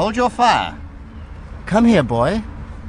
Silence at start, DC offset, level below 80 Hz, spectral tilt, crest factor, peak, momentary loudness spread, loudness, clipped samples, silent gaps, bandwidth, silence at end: 0 s; under 0.1%; -36 dBFS; -6 dB/octave; 16 dB; -2 dBFS; 22 LU; -17 LUFS; under 0.1%; none; 10.5 kHz; 0 s